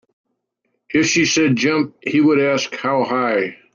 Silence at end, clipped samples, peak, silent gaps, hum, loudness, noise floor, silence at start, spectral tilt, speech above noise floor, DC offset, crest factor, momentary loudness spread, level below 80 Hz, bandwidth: 0.2 s; under 0.1%; -4 dBFS; none; none; -17 LUFS; -72 dBFS; 0.9 s; -4 dB/octave; 55 dB; under 0.1%; 14 dB; 6 LU; -60 dBFS; 7.4 kHz